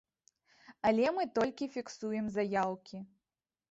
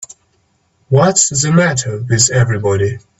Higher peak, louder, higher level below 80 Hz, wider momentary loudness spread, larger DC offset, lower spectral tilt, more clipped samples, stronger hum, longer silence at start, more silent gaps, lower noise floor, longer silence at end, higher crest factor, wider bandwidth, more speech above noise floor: second, -16 dBFS vs 0 dBFS; second, -34 LUFS vs -13 LUFS; second, -70 dBFS vs -46 dBFS; first, 17 LU vs 7 LU; neither; first, -5.5 dB/octave vs -4 dB/octave; neither; neither; first, 0.7 s vs 0 s; neither; first, under -90 dBFS vs -59 dBFS; first, 0.65 s vs 0.2 s; first, 20 dB vs 14 dB; about the same, 8 kHz vs 8.6 kHz; first, over 57 dB vs 46 dB